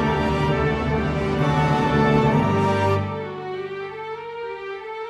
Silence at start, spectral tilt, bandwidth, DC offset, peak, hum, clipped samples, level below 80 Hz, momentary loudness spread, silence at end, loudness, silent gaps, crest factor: 0 s; -7.5 dB/octave; 11 kHz; under 0.1%; -6 dBFS; none; under 0.1%; -38 dBFS; 13 LU; 0 s; -22 LUFS; none; 16 dB